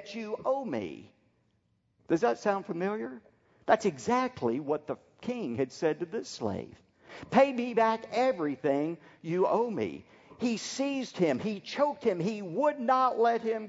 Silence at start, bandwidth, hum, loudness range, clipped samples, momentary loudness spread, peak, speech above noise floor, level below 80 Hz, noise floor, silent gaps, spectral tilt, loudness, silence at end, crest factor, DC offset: 0 s; 8 kHz; none; 4 LU; under 0.1%; 12 LU; -10 dBFS; 43 dB; -72 dBFS; -73 dBFS; none; -5.5 dB/octave; -30 LUFS; 0 s; 22 dB; under 0.1%